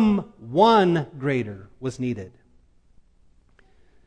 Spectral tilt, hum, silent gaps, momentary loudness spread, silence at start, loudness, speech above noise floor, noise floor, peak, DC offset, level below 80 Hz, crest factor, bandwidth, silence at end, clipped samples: -7 dB/octave; none; none; 18 LU; 0 s; -22 LUFS; 35 dB; -57 dBFS; -4 dBFS; under 0.1%; -54 dBFS; 20 dB; 9.6 kHz; 1.8 s; under 0.1%